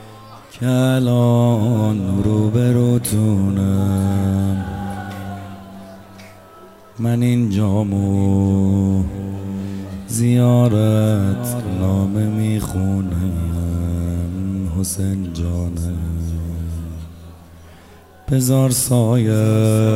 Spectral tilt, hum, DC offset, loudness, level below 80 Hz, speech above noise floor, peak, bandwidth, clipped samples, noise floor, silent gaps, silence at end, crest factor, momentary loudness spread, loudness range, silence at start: -7 dB/octave; none; 0.2%; -18 LUFS; -40 dBFS; 28 dB; -4 dBFS; 16 kHz; under 0.1%; -44 dBFS; none; 0 s; 14 dB; 14 LU; 7 LU; 0 s